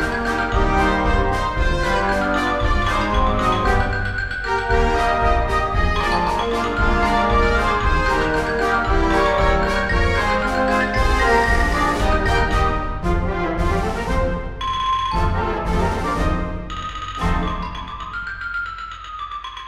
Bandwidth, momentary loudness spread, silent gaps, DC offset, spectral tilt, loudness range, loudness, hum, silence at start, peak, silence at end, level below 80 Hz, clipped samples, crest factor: 13 kHz; 9 LU; none; 0.8%; -5.5 dB/octave; 5 LU; -20 LUFS; none; 0 s; -2 dBFS; 0 s; -24 dBFS; under 0.1%; 16 dB